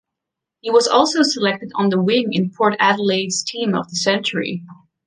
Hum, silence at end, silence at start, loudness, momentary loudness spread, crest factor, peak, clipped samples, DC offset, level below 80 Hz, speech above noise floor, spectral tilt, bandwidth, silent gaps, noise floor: none; 0.35 s; 0.65 s; -18 LUFS; 7 LU; 18 dB; -2 dBFS; under 0.1%; under 0.1%; -64 dBFS; 65 dB; -4 dB/octave; 10 kHz; none; -83 dBFS